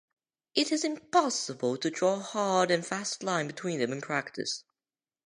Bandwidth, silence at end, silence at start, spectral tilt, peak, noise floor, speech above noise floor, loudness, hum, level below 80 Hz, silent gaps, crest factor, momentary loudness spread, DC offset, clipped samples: 11 kHz; 0.65 s; 0.55 s; -3.5 dB/octave; -10 dBFS; under -90 dBFS; over 60 dB; -30 LUFS; none; -82 dBFS; none; 22 dB; 7 LU; under 0.1%; under 0.1%